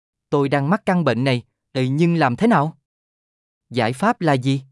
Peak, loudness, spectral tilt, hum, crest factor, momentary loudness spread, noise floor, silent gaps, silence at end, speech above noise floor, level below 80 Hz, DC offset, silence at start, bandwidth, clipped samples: -4 dBFS; -20 LUFS; -7 dB/octave; none; 16 dB; 7 LU; under -90 dBFS; 2.85-3.61 s; 0.1 s; over 72 dB; -64 dBFS; under 0.1%; 0.3 s; 12 kHz; under 0.1%